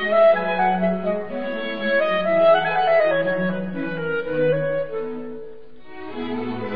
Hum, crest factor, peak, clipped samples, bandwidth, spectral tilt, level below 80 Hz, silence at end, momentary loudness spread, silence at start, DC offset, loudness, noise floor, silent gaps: none; 14 dB; -6 dBFS; under 0.1%; 5.2 kHz; -9 dB/octave; -56 dBFS; 0 s; 15 LU; 0 s; 2%; -21 LUFS; -43 dBFS; none